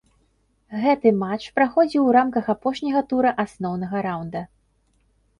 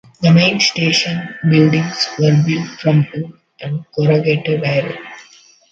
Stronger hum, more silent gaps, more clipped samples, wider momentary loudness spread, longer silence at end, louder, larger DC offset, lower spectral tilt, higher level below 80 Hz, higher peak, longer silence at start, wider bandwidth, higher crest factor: neither; neither; neither; second, 12 LU vs 15 LU; first, 0.95 s vs 0.5 s; second, -21 LUFS vs -15 LUFS; neither; first, -7.5 dB/octave vs -5.5 dB/octave; about the same, -60 dBFS vs -56 dBFS; second, -4 dBFS vs 0 dBFS; first, 0.7 s vs 0.2 s; first, 11 kHz vs 7.8 kHz; about the same, 18 dB vs 16 dB